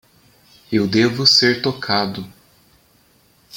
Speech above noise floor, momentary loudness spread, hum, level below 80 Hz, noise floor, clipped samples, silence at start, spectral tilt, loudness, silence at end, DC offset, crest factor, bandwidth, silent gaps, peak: 39 dB; 15 LU; none; -58 dBFS; -56 dBFS; under 0.1%; 0.7 s; -4 dB/octave; -16 LUFS; 0 s; under 0.1%; 20 dB; 17 kHz; none; 0 dBFS